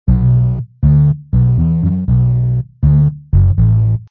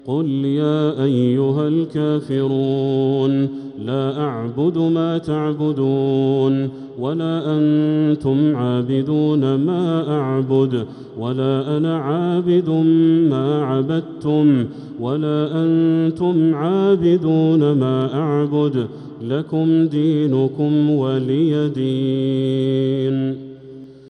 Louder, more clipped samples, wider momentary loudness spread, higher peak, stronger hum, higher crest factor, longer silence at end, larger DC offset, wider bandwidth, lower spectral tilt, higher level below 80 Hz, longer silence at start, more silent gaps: first, -13 LUFS vs -18 LUFS; neither; second, 4 LU vs 7 LU; first, 0 dBFS vs -4 dBFS; neither; about the same, 12 dB vs 12 dB; about the same, 0.05 s vs 0 s; neither; second, 1.9 kHz vs 8.4 kHz; first, -14 dB/octave vs -9.5 dB/octave; first, -20 dBFS vs -58 dBFS; about the same, 0.05 s vs 0.05 s; neither